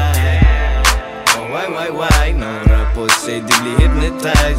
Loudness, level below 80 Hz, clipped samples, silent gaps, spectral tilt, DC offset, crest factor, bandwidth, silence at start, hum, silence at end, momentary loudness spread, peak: -14 LUFS; -16 dBFS; under 0.1%; none; -4 dB/octave; under 0.1%; 14 dB; 16.5 kHz; 0 s; none; 0 s; 5 LU; 0 dBFS